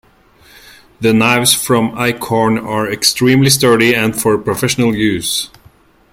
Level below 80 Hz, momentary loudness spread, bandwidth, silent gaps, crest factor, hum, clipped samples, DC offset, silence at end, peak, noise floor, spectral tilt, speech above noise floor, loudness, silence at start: -46 dBFS; 8 LU; 16.5 kHz; none; 14 dB; none; under 0.1%; under 0.1%; 0.65 s; 0 dBFS; -47 dBFS; -4 dB/octave; 34 dB; -12 LUFS; 1 s